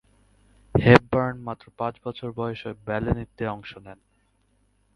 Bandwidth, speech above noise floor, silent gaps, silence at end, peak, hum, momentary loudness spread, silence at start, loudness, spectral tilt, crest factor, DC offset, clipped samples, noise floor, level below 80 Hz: 10 kHz; 42 dB; none; 1 s; 0 dBFS; none; 20 LU; 0.75 s; -24 LUFS; -8 dB/octave; 26 dB; under 0.1%; under 0.1%; -66 dBFS; -46 dBFS